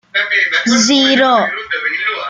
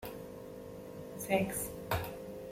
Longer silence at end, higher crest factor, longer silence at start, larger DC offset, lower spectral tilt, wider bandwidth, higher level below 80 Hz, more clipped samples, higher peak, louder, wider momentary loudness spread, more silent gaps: about the same, 0 s vs 0 s; second, 14 dB vs 20 dB; first, 0.15 s vs 0 s; neither; second, -1.5 dB/octave vs -4.5 dB/octave; second, 9.6 kHz vs 16.5 kHz; about the same, -58 dBFS vs -58 dBFS; neither; first, 0 dBFS vs -18 dBFS; first, -12 LUFS vs -38 LUFS; second, 8 LU vs 15 LU; neither